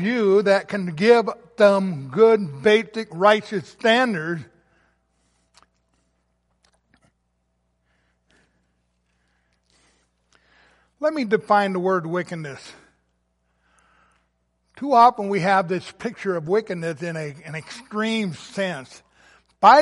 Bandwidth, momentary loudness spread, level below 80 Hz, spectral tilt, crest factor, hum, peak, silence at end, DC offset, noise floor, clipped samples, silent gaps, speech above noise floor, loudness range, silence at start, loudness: 11.5 kHz; 15 LU; -68 dBFS; -5.5 dB/octave; 20 dB; 60 Hz at -60 dBFS; -2 dBFS; 0 s; under 0.1%; -71 dBFS; under 0.1%; none; 50 dB; 10 LU; 0 s; -20 LUFS